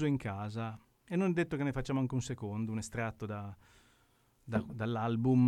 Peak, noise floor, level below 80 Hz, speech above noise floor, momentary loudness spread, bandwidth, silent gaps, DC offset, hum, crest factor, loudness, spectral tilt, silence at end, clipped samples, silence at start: -18 dBFS; -70 dBFS; -58 dBFS; 36 dB; 10 LU; 12.5 kHz; none; under 0.1%; none; 16 dB; -36 LUFS; -7 dB/octave; 0 s; under 0.1%; 0 s